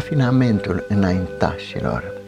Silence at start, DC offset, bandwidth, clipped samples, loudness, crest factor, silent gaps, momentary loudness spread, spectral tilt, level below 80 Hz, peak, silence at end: 0 s; under 0.1%; 9.6 kHz; under 0.1%; -20 LUFS; 18 dB; none; 8 LU; -8 dB/octave; -40 dBFS; -2 dBFS; 0 s